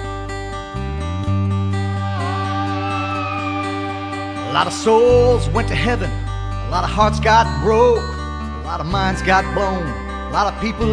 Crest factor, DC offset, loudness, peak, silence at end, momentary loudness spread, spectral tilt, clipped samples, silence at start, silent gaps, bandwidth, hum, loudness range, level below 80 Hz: 18 dB; under 0.1%; -19 LUFS; 0 dBFS; 0 s; 12 LU; -6 dB/octave; under 0.1%; 0 s; none; 10.5 kHz; none; 5 LU; -28 dBFS